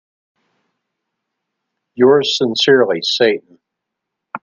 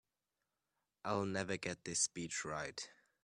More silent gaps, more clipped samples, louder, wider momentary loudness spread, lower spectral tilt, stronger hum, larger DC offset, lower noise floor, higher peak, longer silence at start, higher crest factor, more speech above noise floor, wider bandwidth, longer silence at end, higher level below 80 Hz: neither; neither; first, -14 LUFS vs -40 LUFS; second, 7 LU vs 12 LU; about the same, -4 dB/octave vs -3 dB/octave; neither; neither; second, -79 dBFS vs -90 dBFS; first, 0 dBFS vs -22 dBFS; first, 1.95 s vs 1.05 s; about the same, 18 dB vs 22 dB; first, 66 dB vs 49 dB; second, 7.4 kHz vs 13 kHz; second, 0.05 s vs 0.3 s; first, -64 dBFS vs -74 dBFS